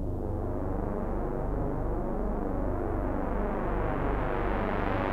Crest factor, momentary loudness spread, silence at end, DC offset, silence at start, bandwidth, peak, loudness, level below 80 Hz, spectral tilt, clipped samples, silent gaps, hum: 16 dB; 3 LU; 0 s; under 0.1%; 0 s; 4.6 kHz; -14 dBFS; -32 LUFS; -34 dBFS; -9.5 dB/octave; under 0.1%; none; none